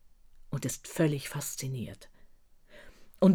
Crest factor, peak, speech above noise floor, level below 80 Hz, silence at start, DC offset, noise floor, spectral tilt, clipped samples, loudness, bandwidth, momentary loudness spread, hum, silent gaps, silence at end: 20 dB; -12 dBFS; 23 dB; -58 dBFS; 0.5 s; under 0.1%; -56 dBFS; -6 dB/octave; under 0.1%; -33 LUFS; 18 kHz; 15 LU; none; none; 0 s